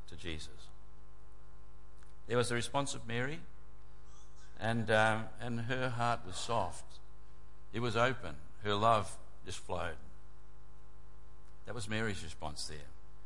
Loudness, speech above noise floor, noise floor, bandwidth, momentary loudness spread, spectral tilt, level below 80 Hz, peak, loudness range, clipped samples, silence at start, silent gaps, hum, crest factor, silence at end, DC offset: -36 LUFS; 22 dB; -58 dBFS; 11.5 kHz; 21 LU; -4.5 dB/octave; -58 dBFS; -16 dBFS; 8 LU; under 0.1%; 0 s; none; none; 24 dB; 0 s; 1%